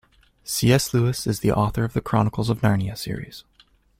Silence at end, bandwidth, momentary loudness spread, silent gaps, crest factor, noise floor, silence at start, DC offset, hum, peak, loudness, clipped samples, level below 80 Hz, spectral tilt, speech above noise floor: 0.6 s; 16.5 kHz; 14 LU; none; 20 dB; -58 dBFS; 0.45 s; under 0.1%; none; -2 dBFS; -22 LUFS; under 0.1%; -44 dBFS; -5.5 dB/octave; 37 dB